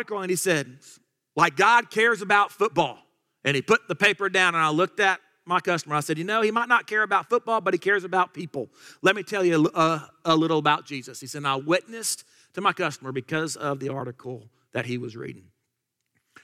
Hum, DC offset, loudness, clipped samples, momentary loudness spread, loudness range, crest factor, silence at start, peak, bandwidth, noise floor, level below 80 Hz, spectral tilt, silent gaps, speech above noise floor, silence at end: none; under 0.1%; -23 LUFS; under 0.1%; 15 LU; 7 LU; 20 dB; 0 s; -6 dBFS; 16 kHz; -80 dBFS; -72 dBFS; -4 dB/octave; none; 56 dB; 1.05 s